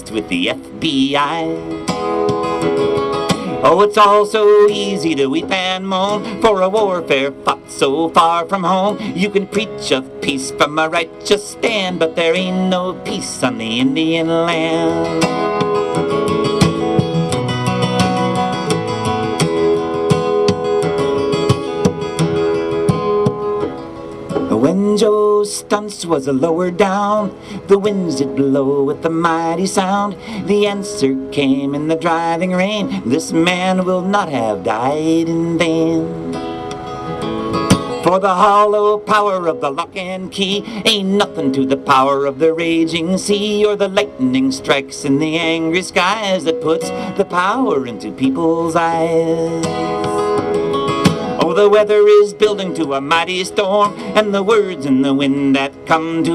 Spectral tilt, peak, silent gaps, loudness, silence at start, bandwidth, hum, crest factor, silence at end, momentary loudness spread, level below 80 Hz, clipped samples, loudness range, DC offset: -5 dB/octave; -2 dBFS; none; -16 LUFS; 0 s; 13.5 kHz; none; 14 dB; 0 s; 7 LU; -48 dBFS; under 0.1%; 4 LU; under 0.1%